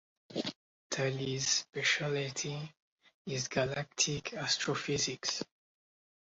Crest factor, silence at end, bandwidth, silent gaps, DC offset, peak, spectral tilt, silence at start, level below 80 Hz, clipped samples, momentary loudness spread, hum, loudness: 20 dB; 0.75 s; 7.6 kHz; 0.56-0.90 s, 2.82-2.96 s, 3.14-3.25 s; under 0.1%; -16 dBFS; -2.5 dB/octave; 0.3 s; -68 dBFS; under 0.1%; 11 LU; none; -34 LUFS